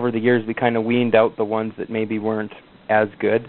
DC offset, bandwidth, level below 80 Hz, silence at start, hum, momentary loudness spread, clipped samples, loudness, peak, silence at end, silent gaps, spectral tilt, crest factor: under 0.1%; 4.3 kHz; -62 dBFS; 0 s; none; 9 LU; under 0.1%; -20 LUFS; -2 dBFS; 0 s; none; -5 dB/octave; 18 dB